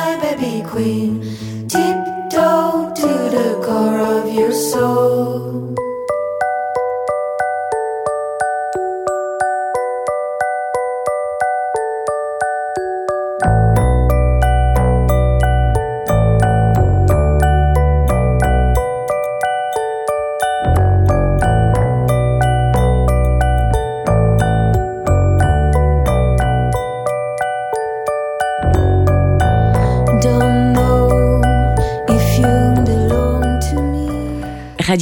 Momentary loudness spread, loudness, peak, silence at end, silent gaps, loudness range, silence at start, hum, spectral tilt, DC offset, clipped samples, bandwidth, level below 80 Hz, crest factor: 7 LU; -16 LUFS; 0 dBFS; 0 s; none; 6 LU; 0 s; none; -7 dB/octave; under 0.1%; under 0.1%; 19.5 kHz; -20 dBFS; 14 dB